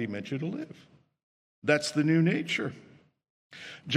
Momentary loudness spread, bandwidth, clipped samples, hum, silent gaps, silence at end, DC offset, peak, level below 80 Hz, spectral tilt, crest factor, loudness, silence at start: 19 LU; 12 kHz; under 0.1%; none; 1.23-1.62 s, 3.30-3.50 s; 0 s; under 0.1%; -8 dBFS; -76 dBFS; -5.5 dB/octave; 22 dB; -29 LUFS; 0 s